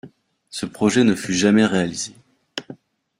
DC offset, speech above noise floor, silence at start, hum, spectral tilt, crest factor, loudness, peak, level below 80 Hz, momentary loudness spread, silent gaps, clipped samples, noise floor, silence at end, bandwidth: under 0.1%; 28 dB; 0.05 s; none; -4.5 dB/octave; 18 dB; -19 LUFS; -4 dBFS; -56 dBFS; 18 LU; none; under 0.1%; -47 dBFS; 0.45 s; 14.5 kHz